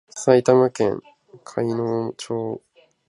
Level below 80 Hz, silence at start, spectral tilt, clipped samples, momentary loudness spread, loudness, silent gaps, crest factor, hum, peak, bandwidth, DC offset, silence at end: -62 dBFS; 0.15 s; -6 dB/octave; under 0.1%; 16 LU; -21 LUFS; none; 20 dB; none; -2 dBFS; 11.5 kHz; under 0.1%; 0.5 s